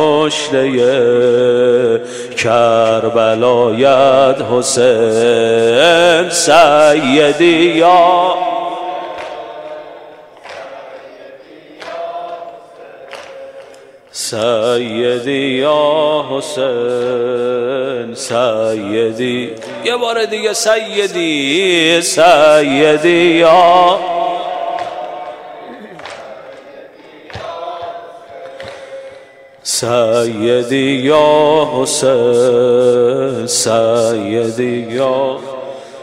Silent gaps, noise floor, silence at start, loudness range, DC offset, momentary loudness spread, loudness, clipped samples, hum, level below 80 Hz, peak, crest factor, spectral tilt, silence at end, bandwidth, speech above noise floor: none; -39 dBFS; 0 s; 20 LU; under 0.1%; 21 LU; -12 LUFS; under 0.1%; none; -58 dBFS; 0 dBFS; 12 dB; -3.5 dB/octave; 0 s; 15.5 kHz; 28 dB